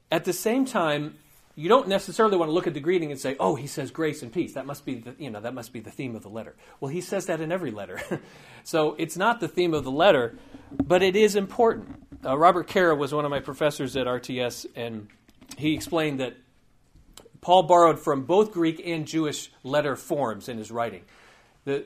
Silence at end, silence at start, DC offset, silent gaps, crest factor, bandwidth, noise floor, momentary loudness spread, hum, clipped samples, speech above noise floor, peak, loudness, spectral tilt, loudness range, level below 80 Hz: 0 s; 0.1 s; under 0.1%; none; 22 dB; 15.5 kHz; -61 dBFS; 16 LU; none; under 0.1%; 36 dB; -4 dBFS; -25 LUFS; -5 dB/octave; 10 LU; -58 dBFS